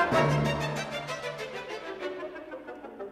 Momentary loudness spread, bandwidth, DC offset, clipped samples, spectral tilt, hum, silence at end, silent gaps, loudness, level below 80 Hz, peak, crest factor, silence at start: 17 LU; 14 kHz; under 0.1%; under 0.1%; -5.5 dB/octave; none; 0 s; none; -31 LUFS; -54 dBFS; -12 dBFS; 18 dB; 0 s